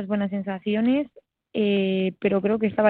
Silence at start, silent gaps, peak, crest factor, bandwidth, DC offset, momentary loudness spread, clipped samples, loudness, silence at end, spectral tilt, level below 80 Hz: 0 s; none; -8 dBFS; 16 dB; 4.3 kHz; under 0.1%; 6 LU; under 0.1%; -24 LUFS; 0 s; -10 dB/octave; -62 dBFS